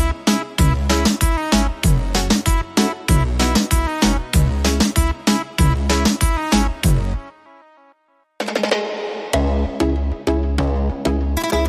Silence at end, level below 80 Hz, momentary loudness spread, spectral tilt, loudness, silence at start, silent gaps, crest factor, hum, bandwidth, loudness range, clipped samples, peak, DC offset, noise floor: 0 s; -22 dBFS; 4 LU; -5 dB/octave; -19 LUFS; 0 s; none; 14 dB; none; 15.5 kHz; 5 LU; under 0.1%; -4 dBFS; under 0.1%; -59 dBFS